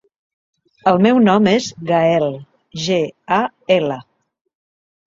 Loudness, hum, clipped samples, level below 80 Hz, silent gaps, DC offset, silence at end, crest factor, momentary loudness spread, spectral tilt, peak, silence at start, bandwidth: -16 LUFS; none; under 0.1%; -58 dBFS; none; under 0.1%; 1.05 s; 16 dB; 12 LU; -6 dB/octave; -2 dBFS; 0.85 s; 7.6 kHz